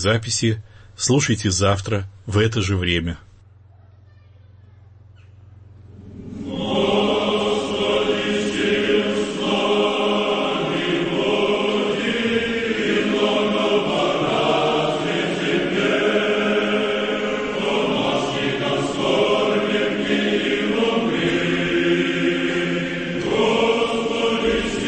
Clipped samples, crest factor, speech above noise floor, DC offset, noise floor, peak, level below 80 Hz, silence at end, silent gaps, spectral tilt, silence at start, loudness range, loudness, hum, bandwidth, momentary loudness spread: under 0.1%; 16 dB; 28 dB; under 0.1%; -48 dBFS; -4 dBFS; -46 dBFS; 0 s; none; -4.5 dB/octave; 0 s; 5 LU; -20 LUFS; none; 8.8 kHz; 4 LU